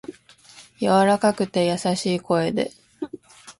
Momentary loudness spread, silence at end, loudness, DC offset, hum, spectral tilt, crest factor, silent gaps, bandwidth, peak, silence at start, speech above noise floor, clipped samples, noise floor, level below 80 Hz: 18 LU; 0.1 s; -21 LUFS; under 0.1%; none; -5.5 dB/octave; 18 dB; none; 11.5 kHz; -6 dBFS; 0.1 s; 29 dB; under 0.1%; -49 dBFS; -60 dBFS